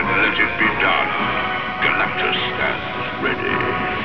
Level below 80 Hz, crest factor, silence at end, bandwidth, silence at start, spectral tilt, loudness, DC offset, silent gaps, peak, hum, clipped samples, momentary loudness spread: -44 dBFS; 14 dB; 0 s; 5.4 kHz; 0 s; -6.5 dB/octave; -18 LUFS; 1%; none; -4 dBFS; none; under 0.1%; 6 LU